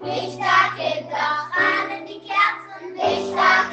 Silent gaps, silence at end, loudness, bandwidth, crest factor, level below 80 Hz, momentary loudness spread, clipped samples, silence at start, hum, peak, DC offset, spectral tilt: none; 0 s; -20 LUFS; 8.6 kHz; 18 dB; -68 dBFS; 11 LU; under 0.1%; 0 s; none; -2 dBFS; under 0.1%; -3.5 dB/octave